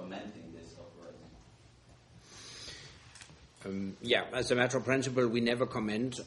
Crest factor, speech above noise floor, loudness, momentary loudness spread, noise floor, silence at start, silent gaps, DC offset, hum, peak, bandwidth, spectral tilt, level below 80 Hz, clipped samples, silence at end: 24 dB; 28 dB; -32 LUFS; 23 LU; -59 dBFS; 0 s; none; under 0.1%; none; -12 dBFS; 11.5 kHz; -4.5 dB/octave; -64 dBFS; under 0.1%; 0 s